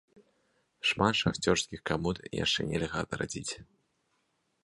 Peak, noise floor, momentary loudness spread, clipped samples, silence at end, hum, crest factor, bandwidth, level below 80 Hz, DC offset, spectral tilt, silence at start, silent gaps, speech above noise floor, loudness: -10 dBFS; -76 dBFS; 9 LU; under 0.1%; 1 s; none; 24 dB; 11.5 kHz; -54 dBFS; under 0.1%; -4 dB/octave; 0.85 s; none; 45 dB; -31 LUFS